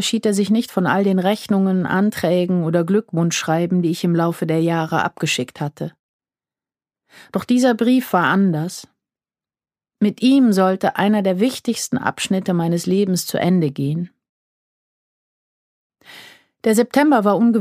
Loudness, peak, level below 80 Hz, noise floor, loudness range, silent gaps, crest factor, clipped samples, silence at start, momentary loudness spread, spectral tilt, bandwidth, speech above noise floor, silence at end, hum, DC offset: -18 LUFS; -2 dBFS; -66 dBFS; under -90 dBFS; 5 LU; 5.99-6.19 s, 14.29-15.90 s; 18 dB; under 0.1%; 0 s; 8 LU; -5.5 dB/octave; 15.5 kHz; over 73 dB; 0 s; none; under 0.1%